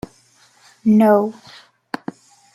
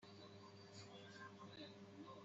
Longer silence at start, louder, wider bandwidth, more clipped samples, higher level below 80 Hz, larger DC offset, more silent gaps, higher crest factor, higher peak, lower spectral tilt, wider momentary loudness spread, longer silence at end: first, 0.85 s vs 0 s; first, -16 LUFS vs -59 LUFS; first, 13 kHz vs 8 kHz; neither; first, -58 dBFS vs -90 dBFS; neither; neither; about the same, 18 dB vs 16 dB; first, -2 dBFS vs -44 dBFS; first, -8 dB/octave vs -3.5 dB/octave; first, 21 LU vs 3 LU; first, 1.25 s vs 0 s